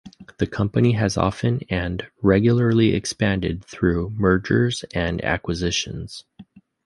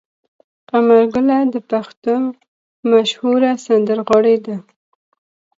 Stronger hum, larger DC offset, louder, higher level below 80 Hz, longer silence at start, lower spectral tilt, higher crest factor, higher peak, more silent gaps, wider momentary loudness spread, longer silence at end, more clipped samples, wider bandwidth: neither; neither; second, -21 LUFS vs -15 LUFS; first, -38 dBFS vs -60 dBFS; second, 0.05 s vs 0.75 s; about the same, -6 dB/octave vs -5.5 dB/octave; about the same, 18 dB vs 16 dB; about the same, -2 dBFS vs 0 dBFS; second, none vs 1.97-2.02 s, 2.48-2.83 s; about the same, 10 LU vs 10 LU; second, 0.45 s vs 0.95 s; neither; first, 11.5 kHz vs 7.8 kHz